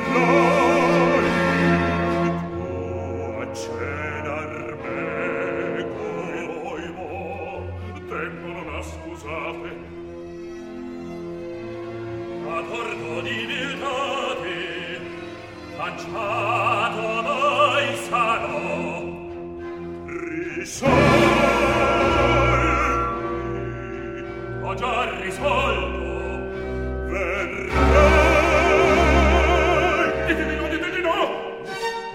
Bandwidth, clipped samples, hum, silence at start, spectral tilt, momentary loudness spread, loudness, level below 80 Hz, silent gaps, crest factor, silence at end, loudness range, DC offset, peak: 14.5 kHz; under 0.1%; none; 0 s; -5.5 dB/octave; 16 LU; -22 LUFS; -32 dBFS; none; 20 dB; 0 s; 14 LU; under 0.1%; -2 dBFS